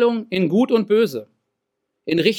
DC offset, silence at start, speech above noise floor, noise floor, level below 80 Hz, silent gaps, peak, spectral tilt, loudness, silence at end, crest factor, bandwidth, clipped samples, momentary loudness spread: under 0.1%; 0 s; 59 dB; -77 dBFS; -68 dBFS; none; -4 dBFS; -6.5 dB/octave; -19 LUFS; 0 s; 16 dB; 17 kHz; under 0.1%; 12 LU